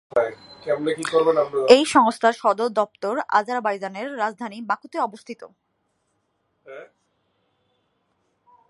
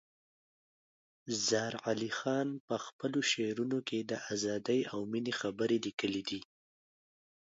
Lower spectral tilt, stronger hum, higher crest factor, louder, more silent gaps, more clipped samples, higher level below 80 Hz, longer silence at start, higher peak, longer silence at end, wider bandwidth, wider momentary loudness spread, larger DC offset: about the same, -3.5 dB/octave vs -3.5 dB/octave; neither; about the same, 24 dB vs 20 dB; first, -21 LUFS vs -35 LUFS; second, none vs 2.60-2.68 s, 2.93-2.99 s; neither; first, -68 dBFS vs -76 dBFS; second, 0.15 s vs 1.25 s; first, 0 dBFS vs -18 dBFS; first, 1.85 s vs 1.05 s; first, 11.5 kHz vs 7.6 kHz; first, 22 LU vs 7 LU; neither